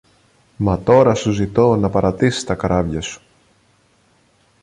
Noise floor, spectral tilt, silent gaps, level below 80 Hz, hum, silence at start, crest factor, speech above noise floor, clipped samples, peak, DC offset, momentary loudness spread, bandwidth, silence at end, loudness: -57 dBFS; -6.5 dB/octave; none; -38 dBFS; none; 0.6 s; 16 dB; 41 dB; under 0.1%; -2 dBFS; under 0.1%; 11 LU; 11 kHz; 1.45 s; -17 LUFS